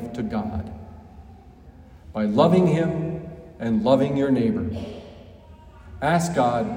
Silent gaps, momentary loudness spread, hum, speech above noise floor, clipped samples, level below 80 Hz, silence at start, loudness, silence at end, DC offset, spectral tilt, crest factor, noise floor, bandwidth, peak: none; 20 LU; none; 25 dB; under 0.1%; -48 dBFS; 0 s; -22 LUFS; 0 s; under 0.1%; -7 dB/octave; 20 dB; -46 dBFS; 16 kHz; -4 dBFS